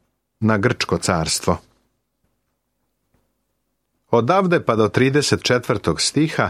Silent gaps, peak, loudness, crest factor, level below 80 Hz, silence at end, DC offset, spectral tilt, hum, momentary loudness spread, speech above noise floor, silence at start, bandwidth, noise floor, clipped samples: none; -2 dBFS; -19 LUFS; 18 dB; -48 dBFS; 0 s; under 0.1%; -4.5 dB/octave; none; 4 LU; 55 dB; 0.4 s; 15.5 kHz; -73 dBFS; under 0.1%